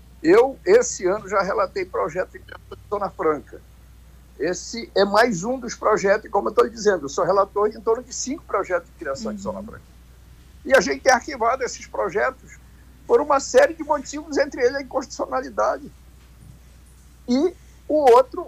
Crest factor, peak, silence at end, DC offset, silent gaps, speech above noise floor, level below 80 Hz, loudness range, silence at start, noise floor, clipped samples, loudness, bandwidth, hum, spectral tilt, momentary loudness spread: 20 dB; -2 dBFS; 0 s; under 0.1%; none; 27 dB; -48 dBFS; 6 LU; 0.2 s; -48 dBFS; under 0.1%; -21 LUFS; 15.5 kHz; none; -4 dB/octave; 12 LU